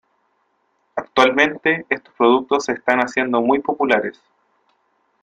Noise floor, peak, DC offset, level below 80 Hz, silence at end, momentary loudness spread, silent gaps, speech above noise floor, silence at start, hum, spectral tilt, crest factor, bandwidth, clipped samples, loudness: -66 dBFS; -2 dBFS; under 0.1%; -60 dBFS; 1.1 s; 9 LU; none; 49 dB; 0.95 s; none; -4 dB/octave; 18 dB; 10.5 kHz; under 0.1%; -18 LUFS